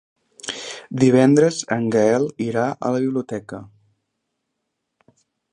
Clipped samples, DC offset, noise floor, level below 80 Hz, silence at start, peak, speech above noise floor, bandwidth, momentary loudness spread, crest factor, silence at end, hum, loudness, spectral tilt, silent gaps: under 0.1%; under 0.1%; -77 dBFS; -64 dBFS; 0.45 s; -2 dBFS; 59 dB; 10.5 kHz; 16 LU; 18 dB; 1.85 s; none; -19 LUFS; -6 dB/octave; none